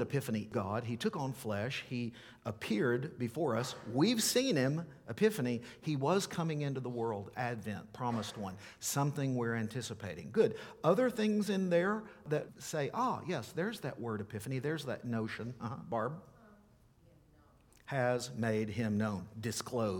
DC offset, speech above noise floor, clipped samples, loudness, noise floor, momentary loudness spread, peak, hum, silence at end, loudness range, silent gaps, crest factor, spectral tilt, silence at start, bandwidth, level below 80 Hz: under 0.1%; 29 dB; under 0.1%; -36 LUFS; -65 dBFS; 10 LU; -16 dBFS; none; 0 s; 7 LU; none; 20 dB; -5 dB/octave; 0 s; 19 kHz; -70 dBFS